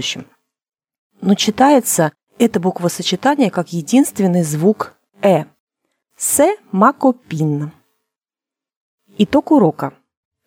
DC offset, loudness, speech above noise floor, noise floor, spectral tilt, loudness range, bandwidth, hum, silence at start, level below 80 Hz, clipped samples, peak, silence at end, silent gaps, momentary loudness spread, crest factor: under 0.1%; -16 LUFS; 75 dB; -89 dBFS; -5 dB/octave; 3 LU; 17 kHz; none; 0 s; -58 dBFS; under 0.1%; 0 dBFS; 0.55 s; 0.98-1.10 s, 5.60-5.67 s, 8.76-8.98 s; 11 LU; 16 dB